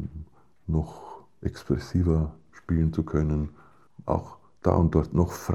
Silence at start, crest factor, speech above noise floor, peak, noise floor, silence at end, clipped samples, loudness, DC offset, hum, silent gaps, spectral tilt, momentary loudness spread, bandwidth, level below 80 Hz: 0 s; 22 dB; 22 dB; -6 dBFS; -47 dBFS; 0 s; under 0.1%; -27 LUFS; 0.1%; none; none; -8.5 dB/octave; 21 LU; 13.5 kHz; -38 dBFS